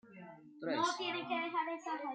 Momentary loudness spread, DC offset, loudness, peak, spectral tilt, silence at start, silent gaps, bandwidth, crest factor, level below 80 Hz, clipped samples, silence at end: 19 LU; under 0.1%; -38 LUFS; -22 dBFS; -3 dB/octave; 0.05 s; none; 9.4 kHz; 18 dB; under -90 dBFS; under 0.1%; 0 s